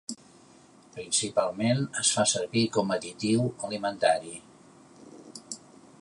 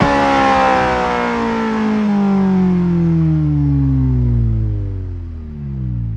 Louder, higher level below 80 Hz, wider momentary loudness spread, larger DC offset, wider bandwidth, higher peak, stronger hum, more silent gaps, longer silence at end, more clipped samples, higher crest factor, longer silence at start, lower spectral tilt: second, -27 LUFS vs -15 LUFS; second, -68 dBFS vs -26 dBFS; first, 19 LU vs 12 LU; neither; first, 11.5 kHz vs 9 kHz; second, -10 dBFS vs 0 dBFS; neither; neither; first, 0.45 s vs 0 s; neither; first, 20 dB vs 14 dB; about the same, 0.1 s vs 0 s; second, -3.5 dB/octave vs -8 dB/octave